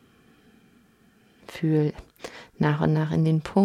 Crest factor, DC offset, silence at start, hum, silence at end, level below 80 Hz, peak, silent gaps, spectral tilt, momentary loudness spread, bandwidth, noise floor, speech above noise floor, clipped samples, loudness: 18 dB; under 0.1%; 1.5 s; none; 0 s; -54 dBFS; -8 dBFS; none; -8.5 dB/octave; 19 LU; 10 kHz; -59 dBFS; 37 dB; under 0.1%; -24 LUFS